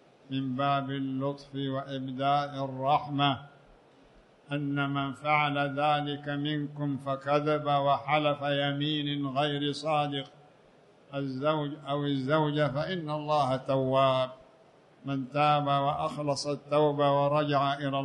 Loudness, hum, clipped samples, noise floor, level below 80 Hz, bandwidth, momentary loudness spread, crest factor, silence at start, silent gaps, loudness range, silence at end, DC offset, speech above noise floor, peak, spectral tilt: -29 LUFS; none; under 0.1%; -59 dBFS; -68 dBFS; 10.5 kHz; 9 LU; 18 dB; 0.3 s; none; 3 LU; 0 s; under 0.1%; 30 dB; -10 dBFS; -6.5 dB/octave